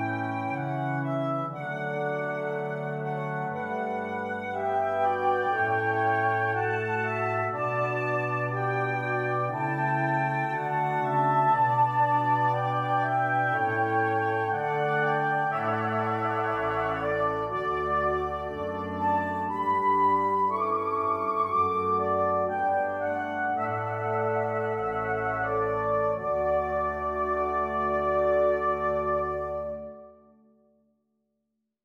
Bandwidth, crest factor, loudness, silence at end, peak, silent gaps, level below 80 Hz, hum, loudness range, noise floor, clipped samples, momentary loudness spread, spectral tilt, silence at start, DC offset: 10 kHz; 14 dB; -27 LUFS; 1.7 s; -12 dBFS; none; -54 dBFS; none; 5 LU; -80 dBFS; under 0.1%; 7 LU; -8 dB/octave; 0 s; under 0.1%